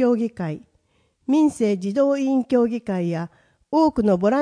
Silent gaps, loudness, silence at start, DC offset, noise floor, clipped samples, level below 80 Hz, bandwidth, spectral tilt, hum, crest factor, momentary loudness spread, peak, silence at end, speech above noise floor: none; -21 LUFS; 0 s; under 0.1%; -65 dBFS; under 0.1%; -54 dBFS; 10.5 kHz; -7.5 dB/octave; none; 14 dB; 12 LU; -6 dBFS; 0 s; 45 dB